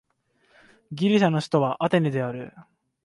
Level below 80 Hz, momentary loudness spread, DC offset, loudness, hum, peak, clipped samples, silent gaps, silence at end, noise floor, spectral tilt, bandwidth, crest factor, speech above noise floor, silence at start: -68 dBFS; 18 LU; under 0.1%; -23 LUFS; none; -8 dBFS; under 0.1%; none; 0.45 s; -67 dBFS; -7 dB/octave; 11.5 kHz; 18 dB; 44 dB; 0.9 s